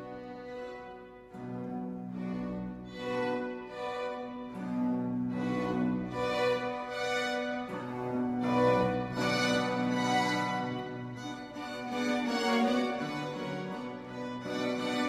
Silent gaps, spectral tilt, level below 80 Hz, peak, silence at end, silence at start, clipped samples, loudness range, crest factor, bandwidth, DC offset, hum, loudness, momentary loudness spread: none; -5.5 dB/octave; -62 dBFS; -16 dBFS; 0 s; 0 s; under 0.1%; 7 LU; 18 dB; 14 kHz; under 0.1%; none; -33 LUFS; 13 LU